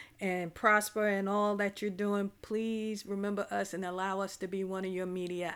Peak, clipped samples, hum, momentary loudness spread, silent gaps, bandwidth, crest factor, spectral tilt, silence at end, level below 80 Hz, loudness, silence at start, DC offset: -12 dBFS; under 0.1%; none; 9 LU; none; 18.5 kHz; 22 dB; -5 dB/octave; 0 s; -70 dBFS; -33 LUFS; 0 s; under 0.1%